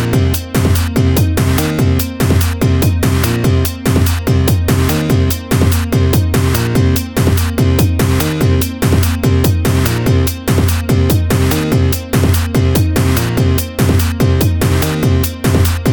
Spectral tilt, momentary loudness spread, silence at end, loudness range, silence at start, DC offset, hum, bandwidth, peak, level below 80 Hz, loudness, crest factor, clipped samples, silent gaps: -6 dB/octave; 2 LU; 0 s; 0 LU; 0 s; 0.3%; none; over 20 kHz; 0 dBFS; -22 dBFS; -13 LUFS; 12 dB; under 0.1%; none